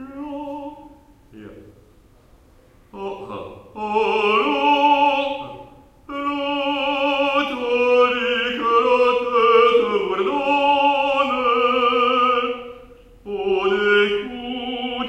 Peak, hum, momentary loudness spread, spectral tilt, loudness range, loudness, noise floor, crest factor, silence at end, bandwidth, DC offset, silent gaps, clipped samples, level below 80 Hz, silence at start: -4 dBFS; none; 16 LU; -4.5 dB/octave; 11 LU; -18 LUFS; -51 dBFS; 18 dB; 0 s; 8.4 kHz; under 0.1%; none; under 0.1%; -54 dBFS; 0 s